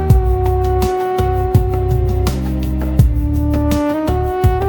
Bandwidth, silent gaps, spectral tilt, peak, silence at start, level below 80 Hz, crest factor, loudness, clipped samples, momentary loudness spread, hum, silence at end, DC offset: 19 kHz; none; -8 dB/octave; 0 dBFS; 0 s; -18 dBFS; 14 dB; -16 LUFS; under 0.1%; 3 LU; none; 0 s; under 0.1%